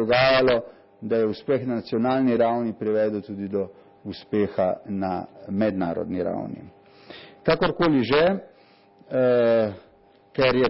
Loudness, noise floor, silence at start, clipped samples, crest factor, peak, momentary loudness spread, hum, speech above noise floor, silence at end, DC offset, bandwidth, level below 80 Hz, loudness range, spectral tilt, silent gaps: -23 LUFS; -54 dBFS; 0 s; under 0.1%; 14 dB; -8 dBFS; 15 LU; none; 32 dB; 0 s; under 0.1%; 5.8 kHz; -54 dBFS; 5 LU; -10.5 dB/octave; none